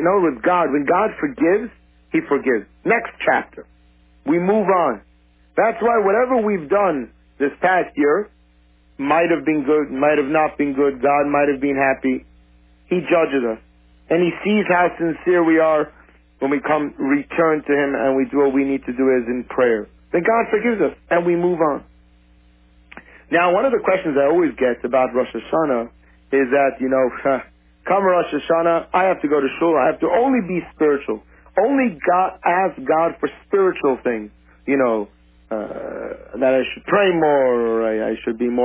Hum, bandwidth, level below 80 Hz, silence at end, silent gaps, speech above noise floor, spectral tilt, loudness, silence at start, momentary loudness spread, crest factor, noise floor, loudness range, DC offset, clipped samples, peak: none; 3.8 kHz; -52 dBFS; 0 s; none; 36 dB; -10 dB/octave; -19 LUFS; 0 s; 8 LU; 14 dB; -54 dBFS; 2 LU; under 0.1%; under 0.1%; -4 dBFS